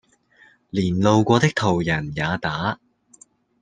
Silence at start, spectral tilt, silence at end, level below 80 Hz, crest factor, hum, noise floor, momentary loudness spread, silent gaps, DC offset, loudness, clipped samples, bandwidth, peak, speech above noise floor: 0.75 s; -6 dB/octave; 0.85 s; -52 dBFS; 20 dB; none; -55 dBFS; 10 LU; none; under 0.1%; -21 LUFS; under 0.1%; 9.8 kHz; -2 dBFS; 35 dB